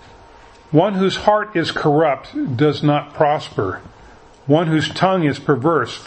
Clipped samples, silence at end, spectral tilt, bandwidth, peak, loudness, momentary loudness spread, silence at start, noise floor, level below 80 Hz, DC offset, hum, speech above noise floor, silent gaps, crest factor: under 0.1%; 0 s; -6.5 dB/octave; 8.6 kHz; 0 dBFS; -18 LUFS; 8 LU; 0.7 s; -44 dBFS; -50 dBFS; under 0.1%; none; 27 dB; none; 18 dB